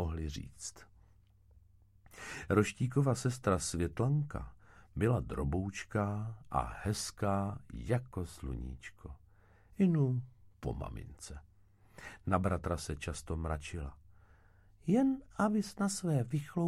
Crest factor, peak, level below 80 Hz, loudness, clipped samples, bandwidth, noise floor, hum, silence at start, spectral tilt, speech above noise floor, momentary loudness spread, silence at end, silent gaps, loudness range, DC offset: 22 dB; -14 dBFS; -50 dBFS; -35 LUFS; under 0.1%; 14.5 kHz; -64 dBFS; none; 0 s; -6.5 dB/octave; 30 dB; 17 LU; 0 s; none; 5 LU; under 0.1%